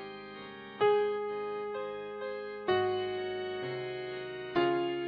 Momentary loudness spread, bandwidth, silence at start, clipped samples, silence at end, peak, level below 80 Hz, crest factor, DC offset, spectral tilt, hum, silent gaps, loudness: 13 LU; 5.4 kHz; 0 s; under 0.1%; 0 s; -14 dBFS; -72 dBFS; 18 dB; under 0.1%; -8 dB/octave; none; none; -33 LUFS